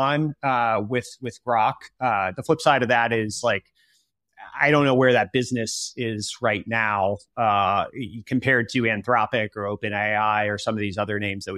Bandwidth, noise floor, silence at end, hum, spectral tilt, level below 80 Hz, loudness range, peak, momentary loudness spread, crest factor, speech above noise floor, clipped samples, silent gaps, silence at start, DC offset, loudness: 14 kHz; -67 dBFS; 0 s; none; -5 dB/octave; -62 dBFS; 2 LU; -4 dBFS; 9 LU; 20 dB; 44 dB; under 0.1%; none; 0 s; under 0.1%; -23 LUFS